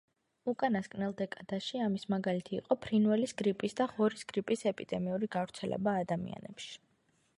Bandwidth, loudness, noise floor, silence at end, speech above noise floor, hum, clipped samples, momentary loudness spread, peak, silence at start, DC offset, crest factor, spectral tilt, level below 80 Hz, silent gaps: 11.5 kHz; -34 LUFS; -73 dBFS; 0.6 s; 40 dB; none; under 0.1%; 10 LU; -14 dBFS; 0.45 s; under 0.1%; 20 dB; -6 dB/octave; -70 dBFS; none